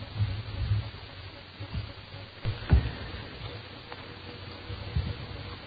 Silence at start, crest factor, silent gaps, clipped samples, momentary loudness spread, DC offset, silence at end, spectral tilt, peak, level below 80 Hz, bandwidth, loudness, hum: 0 s; 22 dB; none; under 0.1%; 16 LU; under 0.1%; 0 s; -8.5 dB/octave; -10 dBFS; -38 dBFS; 5 kHz; -35 LUFS; none